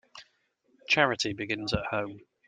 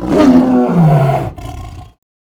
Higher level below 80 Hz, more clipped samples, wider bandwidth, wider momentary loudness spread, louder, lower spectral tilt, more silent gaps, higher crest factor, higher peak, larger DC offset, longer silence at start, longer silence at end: second, -54 dBFS vs -34 dBFS; neither; second, 9.6 kHz vs 13.5 kHz; second, 9 LU vs 20 LU; second, -28 LUFS vs -10 LUFS; second, -4 dB/octave vs -8.5 dB/octave; neither; first, 24 dB vs 12 dB; second, -6 dBFS vs 0 dBFS; neither; first, 0.15 s vs 0 s; about the same, 0.3 s vs 0.35 s